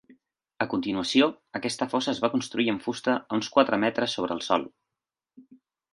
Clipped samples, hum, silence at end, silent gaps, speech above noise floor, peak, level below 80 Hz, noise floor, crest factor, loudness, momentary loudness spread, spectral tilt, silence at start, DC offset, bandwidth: under 0.1%; none; 0.4 s; none; 62 dB; -4 dBFS; -66 dBFS; -88 dBFS; 22 dB; -26 LUFS; 7 LU; -4 dB/octave; 0.6 s; under 0.1%; 11.5 kHz